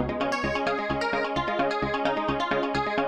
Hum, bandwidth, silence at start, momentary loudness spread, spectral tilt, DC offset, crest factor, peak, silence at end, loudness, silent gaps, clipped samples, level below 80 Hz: none; 11 kHz; 0 s; 1 LU; -5.5 dB/octave; under 0.1%; 16 dB; -10 dBFS; 0 s; -27 LUFS; none; under 0.1%; -46 dBFS